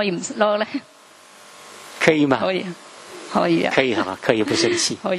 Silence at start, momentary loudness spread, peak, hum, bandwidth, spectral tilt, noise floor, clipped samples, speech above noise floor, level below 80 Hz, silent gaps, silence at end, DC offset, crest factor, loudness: 0 s; 20 LU; 0 dBFS; none; 13 kHz; -4 dB/octave; -47 dBFS; under 0.1%; 27 dB; -62 dBFS; none; 0 s; under 0.1%; 22 dB; -20 LUFS